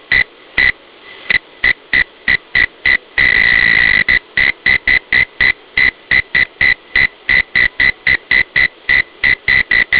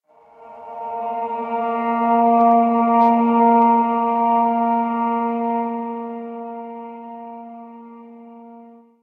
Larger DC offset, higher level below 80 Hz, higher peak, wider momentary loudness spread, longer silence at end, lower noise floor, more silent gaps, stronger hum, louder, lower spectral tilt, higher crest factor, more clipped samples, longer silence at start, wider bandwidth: first, 0.2% vs under 0.1%; first, -36 dBFS vs -74 dBFS; first, 0 dBFS vs -4 dBFS; second, 5 LU vs 21 LU; second, 0 s vs 0.35 s; second, -37 dBFS vs -46 dBFS; neither; neither; first, -11 LUFS vs -18 LUFS; second, -4.5 dB/octave vs -9 dB/octave; about the same, 14 dB vs 16 dB; neither; second, 0.1 s vs 0.4 s; about the same, 4 kHz vs 3.9 kHz